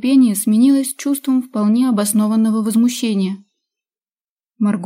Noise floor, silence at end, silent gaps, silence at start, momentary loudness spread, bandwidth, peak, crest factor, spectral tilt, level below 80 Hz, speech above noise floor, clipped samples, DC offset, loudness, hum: under -90 dBFS; 0 s; 4.24-4.37 s; 0.05 s; 7 LU; 16 kHz; -4 dBFS; 12 dB; -5 dB/octave; -70 dBFS; over 75 dB; under 0.1%; under 0.1%; -16 LUFS; none